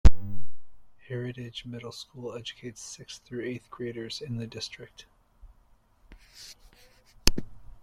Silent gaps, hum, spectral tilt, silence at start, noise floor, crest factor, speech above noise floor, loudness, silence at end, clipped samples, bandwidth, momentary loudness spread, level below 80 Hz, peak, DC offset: none; none; -4.5 dB/octave; 0.05 s; -61 dBFS; 26 dB; 23 dB; -35 LUFS; 0.25 s; under 0.1%; 16 kHz; 20 LU; -34 dBFS; 0 dBFS; under 0.1%